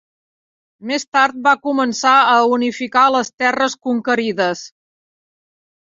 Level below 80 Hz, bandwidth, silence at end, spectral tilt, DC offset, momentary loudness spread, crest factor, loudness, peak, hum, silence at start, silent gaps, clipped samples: -66 dBFS; 7.8 kHz; 1.25 s; -3 dB/octave; under 0.1%; 9 LU; 16 dB; -16 LUFS; -2 dBFS; none; 0.8 s; 1.08-1.12 s, 3.34-3.38 s; under 0.1%